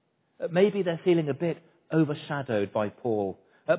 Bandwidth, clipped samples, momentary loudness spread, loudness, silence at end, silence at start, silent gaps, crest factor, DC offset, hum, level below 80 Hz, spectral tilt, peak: 4 kHz; under 0.1%; 10 LU; -28 LUFS; 0 s; 0.4 s; none; 18 dB; under 0.1%; none; -68 dBFS; -11 dB/octave; -10 dBFS